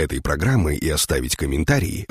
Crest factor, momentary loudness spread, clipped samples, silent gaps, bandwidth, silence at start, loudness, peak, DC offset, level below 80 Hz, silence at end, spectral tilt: 16 dB; 3 LU; under 0.1%; none; 15.5 kHz; 0 s; -21 LUFS; -4 dBFS; under 0.1%; -30 dBFS; 0.05 s; -4.5 dB/octave